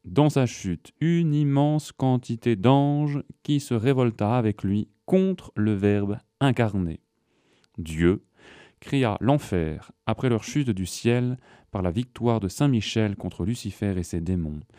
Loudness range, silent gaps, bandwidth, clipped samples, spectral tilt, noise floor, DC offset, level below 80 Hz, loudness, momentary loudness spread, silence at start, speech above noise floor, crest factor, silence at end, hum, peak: 4 LU; none; 15 kHz; under 0.1%; -7 dB/octave; -67 dBFS; under 0.1%; -48 dBFS; -25 LUFS; 9 LU; 0.05 s; 43 dB; 18 dB; 0.2 s; none; -6 dBFS